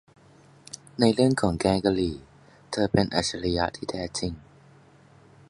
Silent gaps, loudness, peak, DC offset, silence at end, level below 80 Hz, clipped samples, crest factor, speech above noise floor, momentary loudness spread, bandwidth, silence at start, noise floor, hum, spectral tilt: none; -25 LUFS; -4 dBFS; under 0.1%; 1.1 s; -46 dBFS; under 0.1%; 22 dB; 30 dB; 18 LU; 11.5 kHz; 0.75 s; -55 dBFS; none; -5.5 dB/octave